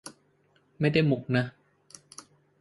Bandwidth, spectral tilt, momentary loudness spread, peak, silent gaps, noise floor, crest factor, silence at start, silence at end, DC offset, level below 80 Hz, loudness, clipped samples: 11.5 kHz; -6.5 dB/octave; 24 LU; -10 dBFS; none; -67 dBFS; 20 dB; 0.05 s; 1.1 s; under 0.1%; -64 dBFS; -27 LUFS; under 0.1%